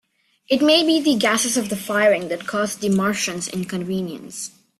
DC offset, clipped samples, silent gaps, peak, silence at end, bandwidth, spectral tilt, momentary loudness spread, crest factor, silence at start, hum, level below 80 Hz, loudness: under 0.1%; under 0.1%; none; -4 dBFS; 0.3 s; 14.5 kHz; -3.5 dB/octave; 11 LU; 16 dB; 0.5 s; none; -62 dBFS; -20 LUFS